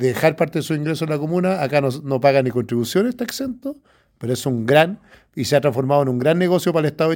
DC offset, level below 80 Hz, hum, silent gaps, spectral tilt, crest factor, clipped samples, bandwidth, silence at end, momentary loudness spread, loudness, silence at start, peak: under 0.1%; -60 dBFS; none; none; -6 dB/octave; 18 dB; under 0.1%; 17 kHz; 0 s; 10 LU; -19 LUFS; 0 s; 0 dBFS